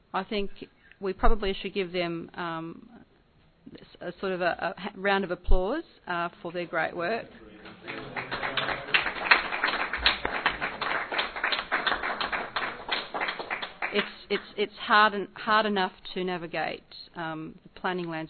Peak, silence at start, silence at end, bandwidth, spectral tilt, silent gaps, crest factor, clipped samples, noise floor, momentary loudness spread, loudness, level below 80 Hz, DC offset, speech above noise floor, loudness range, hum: -4 dBFS; 0.15 s; 0 s; 4.6 kHz; -8.5 dB/octave; none; 26 dB; under 0.1%; -61 dBFS; 14 LU; -29 LUFS; -40 dBFS; under 0.1%; 34 dB; 7 LU; none